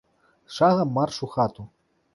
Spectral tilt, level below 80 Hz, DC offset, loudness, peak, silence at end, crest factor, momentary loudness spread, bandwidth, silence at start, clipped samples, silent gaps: -6.5 dB/octave; -60 dBFS; under 0.1%; -23 LUFS; -6 dBFS; 0.5 s; 18 dB; 15 LU; 11.5 kHz; 0.5 s; under 0.1%; none